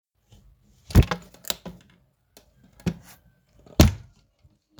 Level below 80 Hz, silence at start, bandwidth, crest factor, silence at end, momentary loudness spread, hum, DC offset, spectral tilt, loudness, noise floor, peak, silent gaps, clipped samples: -34 dBFS; 0.9 s; over 20 kHz; 26 dB; 0.8 s; 21 LU; none; under 0.1%; -5.5 dB/octave; -24 LUFS; -62 dBFS; 0 dBFS; none; under 0.1%